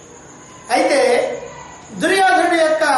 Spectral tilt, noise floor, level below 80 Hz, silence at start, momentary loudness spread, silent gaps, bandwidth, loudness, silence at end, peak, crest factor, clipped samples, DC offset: -3 dB/octave; -40 dBFS; -58 dBFS; 0.3 s; 20 LU; none; 11.5 kHz; -15 LUFS; 0 s; -4 dBFS; 14 dB; under 0.1%; under 0.1%